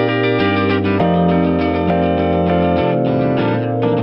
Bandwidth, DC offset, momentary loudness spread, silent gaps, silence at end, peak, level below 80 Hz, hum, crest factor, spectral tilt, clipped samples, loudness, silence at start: 5.6 kHz; under 0.1%; 2 LU; none; 0 s; -2 dBFS; -40 dBFS; none; 12 dB; -10 dB/octave; under 0.1%; -15 LUFS; 0 s